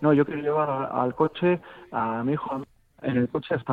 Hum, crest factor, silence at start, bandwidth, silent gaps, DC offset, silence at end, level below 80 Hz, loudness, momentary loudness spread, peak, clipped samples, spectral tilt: none; 16 dB; 0 s; 4.6 kHz; none; under 0.1%; 0 s; -60 dBFS; -26 LUFS; 11 LU; -8 dBFS; under 0.1%; -9.5 dB/octave